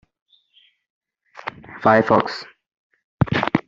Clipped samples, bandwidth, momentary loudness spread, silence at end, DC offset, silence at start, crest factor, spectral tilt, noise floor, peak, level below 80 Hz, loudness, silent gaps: under 0.1%; 7.6 kHz; 19 LU; 0.05 s; under 0.1%; 1.45 s; 22 dB; -7.5 dB/octave; -59 dBFS; -2 dBFS; -50 dBFS; -19 LUFS; 2.79-2.90 s, 3.04-3.18 s